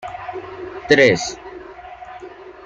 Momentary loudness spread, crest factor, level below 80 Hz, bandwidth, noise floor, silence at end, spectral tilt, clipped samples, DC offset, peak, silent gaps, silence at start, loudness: 24 LU; 20 dB; -52 dBFS; 8.8 kHz; -37 dBFS; 0 s; -4 dB/octave; under 0.1%; under 0.1%; -2 dBFS; none; 0 s; -16 LUFS